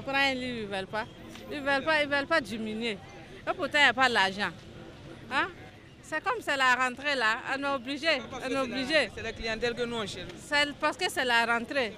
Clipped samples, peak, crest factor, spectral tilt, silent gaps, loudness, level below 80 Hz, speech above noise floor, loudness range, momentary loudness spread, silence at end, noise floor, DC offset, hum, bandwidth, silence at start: under 0.1%; -8 dBFS; 22 dB; -3 dB/octave; none; -28 LUFS; -56 dBFS; 20 dB; 3 LU; 15 LU; 0 s; -49 dBFS; under 0.1%; none; 15.5 kHz; 0 s